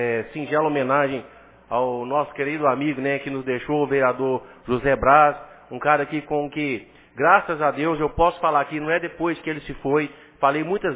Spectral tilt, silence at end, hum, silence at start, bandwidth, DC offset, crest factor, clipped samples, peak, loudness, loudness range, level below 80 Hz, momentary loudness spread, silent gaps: -9.5 dB/octave; 0 s; none; 0 s; 4 kHz; under 0.1%; 20 dB; under 0.1%; -2 dBFS; -22 LUFS; 3 LU; -48 dBFS; 10 LU; none